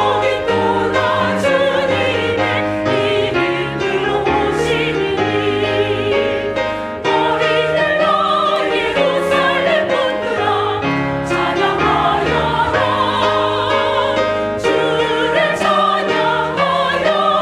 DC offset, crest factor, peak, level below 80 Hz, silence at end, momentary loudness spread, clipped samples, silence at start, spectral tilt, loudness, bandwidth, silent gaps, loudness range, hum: under 0.1%; 14 dB; -2 dBFS; -44 dBFS; 0 s; 4 LU; under 0.1%; 0 s; -5 dB/octave; -15 LUFS; 13 kHz; none; 2 LU; none